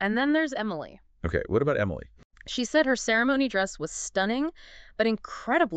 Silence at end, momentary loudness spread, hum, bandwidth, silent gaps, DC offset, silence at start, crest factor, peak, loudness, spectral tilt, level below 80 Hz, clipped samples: 0 s; 13 LU; none; 9.2 kHz; 2.25-2.30 s; under 0.1%; 0 s; 16 dB; -10 dBFS; -27 LUFS; -4.5 dB/octave; -48 dBFS; under 0.1%